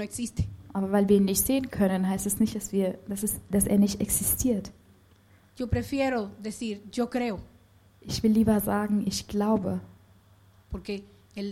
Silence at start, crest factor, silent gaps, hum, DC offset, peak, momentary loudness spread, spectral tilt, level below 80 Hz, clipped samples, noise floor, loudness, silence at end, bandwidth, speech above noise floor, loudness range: 0 s; 18 dB; none; none; under 0.1%; -10 dBFS; 14 LU; -5 dB/octave; -46 dBFS; under 0.1%; -58 dBFS; -27 LUFS; 0 s; 16.5 kHz; 32 dB; 5 LU